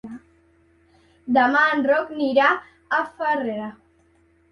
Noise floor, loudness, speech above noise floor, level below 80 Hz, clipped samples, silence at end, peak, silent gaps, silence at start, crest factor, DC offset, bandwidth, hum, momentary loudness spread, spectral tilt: -60 dBFS; -21 LUFS; 39 dB; -64 dBFS; under 0.1%; 0.8 s; -4 dBFS; none; 0.05 s; 18 dB; under 0.1%; 10.5 kHz; none; 19 LU; -5.5 dB/octave